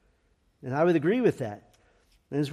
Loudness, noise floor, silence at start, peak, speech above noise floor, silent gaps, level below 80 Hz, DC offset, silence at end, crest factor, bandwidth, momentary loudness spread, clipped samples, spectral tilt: -27 LUFS; -68 dBFS; 0.65 s; -12 dBFS; 43 dB; none; -68 dBFS; under 0.1%; 0 s; 16 dB; 12.5 kHz; 17 LU; under 0.1%; -7.5 dB/octave